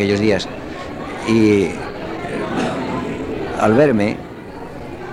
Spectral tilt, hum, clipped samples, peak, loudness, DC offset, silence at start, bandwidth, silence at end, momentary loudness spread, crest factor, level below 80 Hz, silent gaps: -6.5 dB/octave; none; under 0.1%; -2 dBFS; -19 LUFS; under 0.1%; 0 s; 12.5 kHz; 0 s; 17 LU; 16 dB; -42 dBFS; none